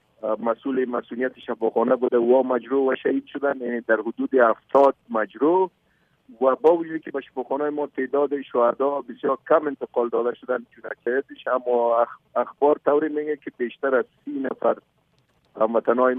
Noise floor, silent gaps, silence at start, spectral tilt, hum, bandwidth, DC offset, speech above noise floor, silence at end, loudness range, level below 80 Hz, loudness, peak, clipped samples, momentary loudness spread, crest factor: -65 dBFS; none; 0.25 s; -8 dB/octave; none; 4.1 kHz; under 0.1%; 42 dB; 0 s; 3 LU; -74 dBFS; -23 LUFS; -6 dBFS; under 0.1%; 10 LU; 18 dB